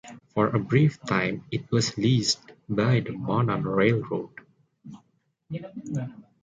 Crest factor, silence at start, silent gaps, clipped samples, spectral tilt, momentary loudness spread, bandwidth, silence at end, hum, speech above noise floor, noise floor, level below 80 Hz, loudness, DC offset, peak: 18 dB; 0.05 s; none; under 0.1%; -5.5 dB/octave; 13 LU; 9 kHz; 0.25 s; none; 44 dB; -69 dBFS; -58 dBFS; -26 LUFS; under 0.1%; -8 dBFS